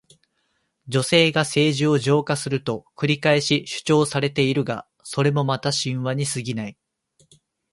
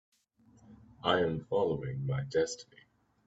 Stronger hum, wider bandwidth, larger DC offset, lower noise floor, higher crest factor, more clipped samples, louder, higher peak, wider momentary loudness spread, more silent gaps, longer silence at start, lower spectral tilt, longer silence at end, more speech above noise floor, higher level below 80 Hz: neither; first, 11.5 kHz vs 8 kHz; neither; first, -71 dBFS vs -65 dBFS; second, 18 dB vs 24 dB; neither; first, -21 LUFS vs -33 LUFS; first, -4 dBFS vs -12 dBFS; first, 10 LU vs 6 LU; neither; first, 0.85 s vs 0.7 s; about the same, -5 dB/octave vs -5.5 dB/octave; first, 1 s vs 0.65 s; first, 50 dB vs 33 dB; about the same, -60 dBFS vs -62 dBFS